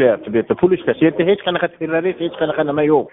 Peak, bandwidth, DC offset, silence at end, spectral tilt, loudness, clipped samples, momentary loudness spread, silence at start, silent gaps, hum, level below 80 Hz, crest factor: -2 dBFS; 3.9 kHz; under 0.1%; 0.05 s; -4.5 dB/octave; -17 LUFS; under 0.1%; 5 LU; 0 s; none; none; -54 dBFS; 16 dB